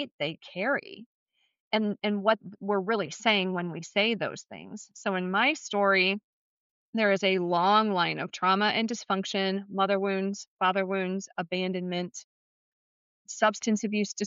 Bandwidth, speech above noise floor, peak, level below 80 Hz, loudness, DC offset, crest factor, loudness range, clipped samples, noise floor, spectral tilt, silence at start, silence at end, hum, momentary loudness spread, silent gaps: 7.8 kHz; over 62 dB; -12 dBFS; -82 dBFS; -28 LUFS; under 0.1%; 18 dB; 5 LU; under 0.1%; under -90 dBFS; -2.5 dB/octave; 0 s; 0 s; none; 10 LU; 0.11-0.19 s, 1.06-1.26 s, 1.60-1.71 s, 6.24-6.93 s, 10.48-10.57 s, 12.24-13.25 s